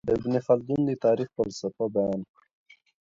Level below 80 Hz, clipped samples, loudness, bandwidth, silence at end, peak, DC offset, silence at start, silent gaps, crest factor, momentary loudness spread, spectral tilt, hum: -58 dBFS; under 0.1%; -27 LUFS; 7.8 kHz; 0.8 s; -10 dBFS; under 0.1%; 0.05 s; none; 18 dB; 7 LU; -7.5 dB/octave; none